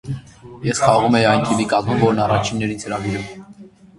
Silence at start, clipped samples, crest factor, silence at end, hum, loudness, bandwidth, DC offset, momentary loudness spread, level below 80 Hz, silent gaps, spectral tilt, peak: 0.05 s; under 0.1%; 18 dB; 0.3 s; none; -18 LUFS; 11.5 kHz; under 0.1%; 16 LU; -46 dBFS; none; -5.5 dB/octave; 0 dBFS